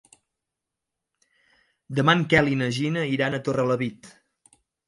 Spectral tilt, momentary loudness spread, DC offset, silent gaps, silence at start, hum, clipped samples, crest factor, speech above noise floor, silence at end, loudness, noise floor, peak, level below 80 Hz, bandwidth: -6 dB/octave; 8 LU; under 0.1%; none; 1.9 s; none; under 0.1%; 22 dB; 62 dB; 0.8 s; -23 LUFS; -85 dBFS; -4 dBFS; -58 dBFS; 11.5 kHz